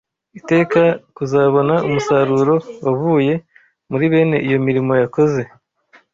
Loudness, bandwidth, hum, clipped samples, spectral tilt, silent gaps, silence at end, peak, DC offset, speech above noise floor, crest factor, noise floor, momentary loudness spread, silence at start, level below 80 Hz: -16 LUFS; 7.6 kHz; none; under 0.1%; -7.5 dB/octave; none; 0.7 s; -2 dBFS; under 0.1%; 37 dB; 14 dB; -53 dBFS; 9 LU; 0.35 s; -56 dBFS